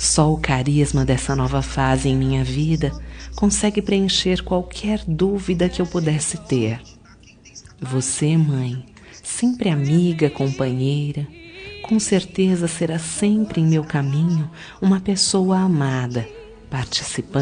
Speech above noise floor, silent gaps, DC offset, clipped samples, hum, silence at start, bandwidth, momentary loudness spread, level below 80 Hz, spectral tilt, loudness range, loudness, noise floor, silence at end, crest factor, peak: 28 dB; none; under 0.1%; under 0.1%; none; 0 s; 10 kHz; 10 LU; -36 dBFS; -5 dB/octave; 3 LU; -20 LUFS; -47 dBFS; 0 s; 18 dB; -2 dBFS